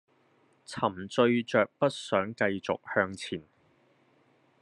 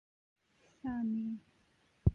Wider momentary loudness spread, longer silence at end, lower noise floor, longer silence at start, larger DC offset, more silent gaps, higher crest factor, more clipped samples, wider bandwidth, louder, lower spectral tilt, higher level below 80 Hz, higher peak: about the same, 12 LU vs 10 LU; first, 1.2 s vs 0 s; second, -66 dBFS vs -72 dBFS; second, 0.7 s vs 0.85 s; neither; neither; about the same, 22 dB vs 24 dB; neither; first, 11 kHz vs 6.4 kHz; first, -29 LUFS vs -39 LUFS; second, -5.5 dB/octave vs -10.5 dB/octave; second, -76 dBFS vs -46 dBFS; first, -8 dBFS vs -16 dBFS